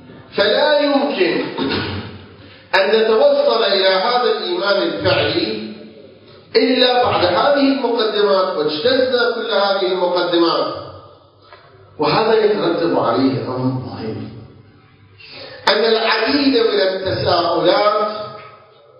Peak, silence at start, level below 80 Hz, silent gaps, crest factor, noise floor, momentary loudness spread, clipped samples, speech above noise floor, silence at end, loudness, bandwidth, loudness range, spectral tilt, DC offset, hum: 0 dBFS; 0.1 s; -50 dBFS; none; 16 dB; -47 dBFS; 14 LU; under 0.1%; 31 dB; 0.5 s; -16 LUFS; 8 kHz; 3 LU; -6.5 dB/octave; under 0.1%; none